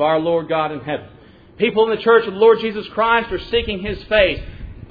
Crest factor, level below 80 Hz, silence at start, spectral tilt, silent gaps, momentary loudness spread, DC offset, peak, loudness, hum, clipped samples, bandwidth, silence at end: 16 dB; -38 dBFS; 0 s; -8 dB/octave; none; 13 LU; under 0.1%; -2 dBFS; -18 LUFS; none; under 0.1%; 5 kHz; 0.05 s